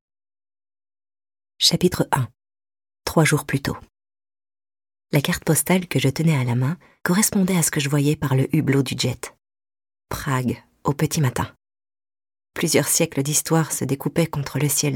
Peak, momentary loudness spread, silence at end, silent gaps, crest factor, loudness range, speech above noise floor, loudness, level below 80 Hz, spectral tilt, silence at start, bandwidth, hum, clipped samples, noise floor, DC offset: -4 dBFS; 10 LU; 0 s; none; 20 dB; 5 LU; over 69 dB; -21 LUFS; -50 dBFS; -4.5 dB/octave; 1.6 s; 19 kHz; none; under 0.1%; under -90 dBFS; under 0.1%